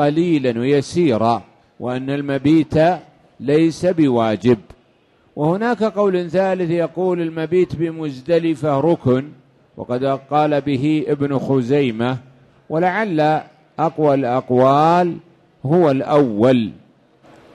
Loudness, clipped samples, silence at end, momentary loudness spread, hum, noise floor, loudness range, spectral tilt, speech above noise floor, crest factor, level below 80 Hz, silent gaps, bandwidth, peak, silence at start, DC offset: -18 LUFS; under 0.1%; 0.8 s; 9 LU; none; -56 dBFS; 3 LU; -7.5 dB/octave; 39 dB; 16 dB; -52 dBFS; none; 11.5 kHz; -2 dBFS; 0 s; under 0.1%